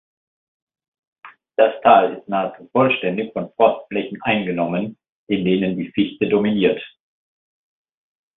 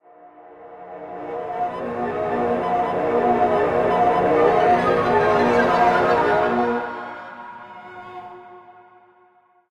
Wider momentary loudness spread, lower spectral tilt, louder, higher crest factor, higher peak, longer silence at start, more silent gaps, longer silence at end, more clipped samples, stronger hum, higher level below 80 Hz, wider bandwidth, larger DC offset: second, 11 LU vs 21 LU; first, -11 dB/octave vs -6.5 dB/octave; about the same, -19 LUFS vs -19 LUFS; about the same, 20 dB vs 16 dB; first, 0 dBFS vs -4 dBFS; first, 1.25 s vs 0.25 s; first, 5.09-5.27 s vs none; first, 1.5 s vs 1 s; neither; neither; second, -60 dBFS vs -52 dBFS; second, 4.1 kHz vs 11 kHz; neither